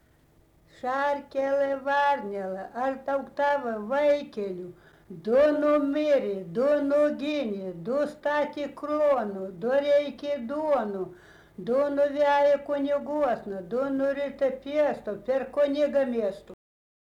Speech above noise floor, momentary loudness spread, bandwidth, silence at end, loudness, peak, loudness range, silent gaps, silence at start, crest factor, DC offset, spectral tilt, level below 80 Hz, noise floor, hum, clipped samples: 35 dB; 11 LU; 7.8 kHz; 0.55 s; -27 LUFS; -14 dBFS; 2 LU; none; 0.85 s; 12 dB; under 0.1%; -6 dB/octave; -64 dBFS; -61 dBFS; none; under 0.1%